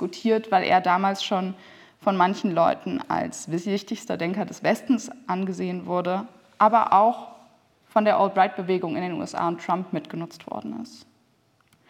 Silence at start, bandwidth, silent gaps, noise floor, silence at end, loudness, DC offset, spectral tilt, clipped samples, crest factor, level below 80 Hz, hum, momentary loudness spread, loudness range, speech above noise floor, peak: 0 s; 15 kHz; none; -64 dBFS; 0.9 s; -24 LUFS; under 0.1%; -5.5 dB/octave; under 0.1%; 20 dB; -72 dBFS; none; 14 LU; 5 LU; 40 dB; -4 dBFS